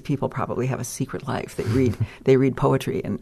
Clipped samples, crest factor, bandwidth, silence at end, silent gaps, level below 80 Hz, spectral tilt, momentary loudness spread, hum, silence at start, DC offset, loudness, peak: under 0.1%; 18 dB; 13.5 kHz; 0.05 s; none; -46 dBFS; -7 dB/octave; 10 LU; none; 0.05 s; under 0.1%; -23 LUFS; -4 dBFS